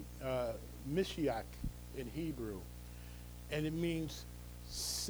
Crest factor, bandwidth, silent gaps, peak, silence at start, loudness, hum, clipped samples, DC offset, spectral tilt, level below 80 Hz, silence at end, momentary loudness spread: 18 dB; over 20 kHz; none; -22 dBFS; 0 s; -41 LUFS; 60 Hz at -50 dBFS; under 0.1%; under 0.1%; -4.5 dB/octave; -52 dBFS; 0 s; 14 LU